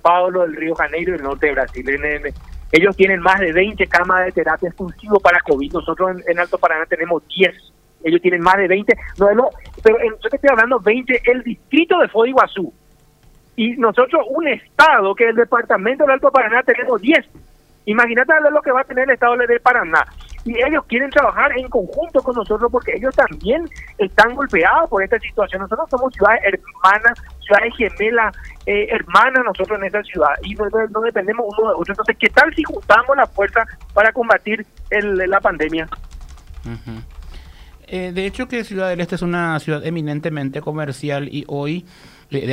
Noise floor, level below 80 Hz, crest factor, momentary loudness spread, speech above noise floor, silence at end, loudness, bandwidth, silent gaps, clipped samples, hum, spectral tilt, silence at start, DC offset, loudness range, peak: -50 dBFS; -40 dBFS; 16 dB; 11 LU; 34 dB; 0 s; -16 LUFS; 15 kHz; none; under 0.1%; none; -6 dB/octave; 0.05 s; under 0.1%; 7 LU; 0 dBFS